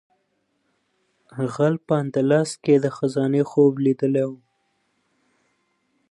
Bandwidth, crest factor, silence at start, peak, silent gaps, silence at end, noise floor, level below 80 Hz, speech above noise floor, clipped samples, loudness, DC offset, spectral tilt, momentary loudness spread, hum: 11.5 kHz; 18 dB; 1.35 s; -6 dBFS; none; 1.75 s; -71 dBFS; -72 dBFS; 51 dB; under 0.1%; -21 LUFS; under 0.1%; -7.5 dB/octave; 10 LU; none